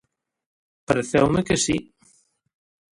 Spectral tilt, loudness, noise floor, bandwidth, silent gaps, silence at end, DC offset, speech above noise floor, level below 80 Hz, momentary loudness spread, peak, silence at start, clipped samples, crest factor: -4.5 dB/octave; -22 LUFS; -61 dBFS; 11.5 kHz; none; 1.15 s; under 0.1%; 41 dB; -48 dBFS; 5 LU; -2 dBFS; 0.9 s; under 0.1%; 22 dB